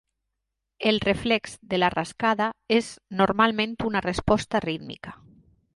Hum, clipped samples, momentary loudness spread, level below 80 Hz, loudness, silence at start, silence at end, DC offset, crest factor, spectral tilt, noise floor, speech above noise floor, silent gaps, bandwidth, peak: none; under 0.1%; 11 LU; -48 dBFS; -25 LUFS; 0.8 s; 0.6 s; under 0.1%; 20 dB; -5 dB/octave; -82 dBFS; 58 dB; none; 11.5 kHz; -6 dBFS